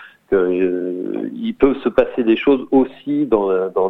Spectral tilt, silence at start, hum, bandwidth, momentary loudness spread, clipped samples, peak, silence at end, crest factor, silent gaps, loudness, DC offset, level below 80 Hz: -8.5 dB/octave; 0 s; none; 4.1 kHz; 9 LU; under 0.1%; 0 dBFS; 0 s; 18 dB; none; -18 LUFS; under 0.1%; -44 dBFS